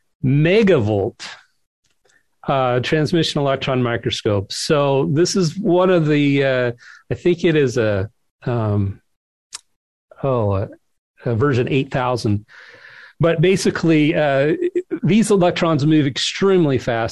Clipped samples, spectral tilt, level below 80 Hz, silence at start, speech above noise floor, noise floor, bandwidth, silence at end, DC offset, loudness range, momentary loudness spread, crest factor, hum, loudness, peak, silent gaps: under 0.1%; -6 dB/octave; -46 dBFS; 0.25 s; 44 dB; -61 dBFS; 12 kHz; 0 s; under 0.1%; 6 LU; 11 LU; 14 dB; none; -18 LUFS; -4 dBFS; 1.66-1.83 s, 8.30-8.39 s, 9.16-9.50 s, 9.76-10.08 s, 10.98-11.14 s